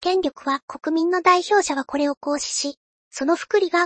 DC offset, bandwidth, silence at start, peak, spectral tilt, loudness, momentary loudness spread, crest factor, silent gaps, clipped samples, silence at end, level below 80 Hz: under 0.1%; 8.8 kHz; 0 s; -4 dBFS; -1 dB/octave; -22 LUFS; 9 LU; 16 dB; 0.62-0.68 s, 2.17-2.21 s, 2.77-3.11 s; under 0.1%; 0 s; -62 dBFS